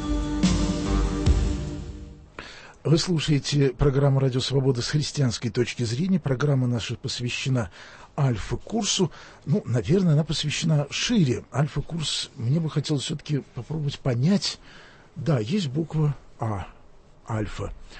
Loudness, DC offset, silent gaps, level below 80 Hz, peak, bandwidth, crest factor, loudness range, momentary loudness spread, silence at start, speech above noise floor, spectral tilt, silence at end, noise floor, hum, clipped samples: -25 LUFS; under 0.1%; none; -36 dBFS; -8 dBFS; 8.8 kHz; 16 dB; 3 LU; 13 LU; 0 s; 25 dB; -5.5 dB/octave; 0 s; -49 dBFS; none; under 0.1%